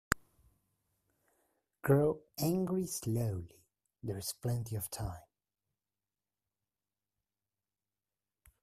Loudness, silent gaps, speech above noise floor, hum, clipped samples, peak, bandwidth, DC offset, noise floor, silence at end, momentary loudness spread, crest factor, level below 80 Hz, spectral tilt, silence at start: -36 LUFS; none; over 56 dB; none; under 0.1%; -6 dBFS; 15.5 kHz; under 0.1%; under -90 dBFS; 3.4 s; 14 LU; 32 dB; -60 dBFS; -5.5 dB/octave; 0.1 s